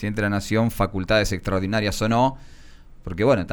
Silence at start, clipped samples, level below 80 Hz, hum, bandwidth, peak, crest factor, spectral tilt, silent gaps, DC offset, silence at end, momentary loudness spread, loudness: 0 s; under 0.1%; -38 dBFS; none; over 20 kHz; -6 dBFS; 16 dB; -5.5 dB/octave; none; under 0.1%; 0 s; 5 LU; -22 LUFS